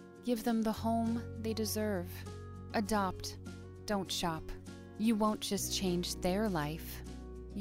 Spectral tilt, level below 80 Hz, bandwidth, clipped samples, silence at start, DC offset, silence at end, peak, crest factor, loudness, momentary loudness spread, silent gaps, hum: -4.5 dB/octave; -52 dBFS; 16 kHz; under 0.1%; 0 s; under 0.1%; 0 s; -20 dBFS; 16 dB; -35 LUFS; 14 LU; none; none